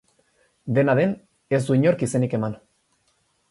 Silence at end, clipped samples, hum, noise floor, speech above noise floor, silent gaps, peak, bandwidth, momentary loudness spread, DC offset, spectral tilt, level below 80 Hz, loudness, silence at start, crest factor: 0.95 s; under 0.1%; none; -67 dBFS; 47 dB; none; -8 dBFS; 11.5 kHz; 16 LU; under 0.1%; -7.5 dB/octave; -62 dBFS; -22 LUFS; 0.65 s; 16 dB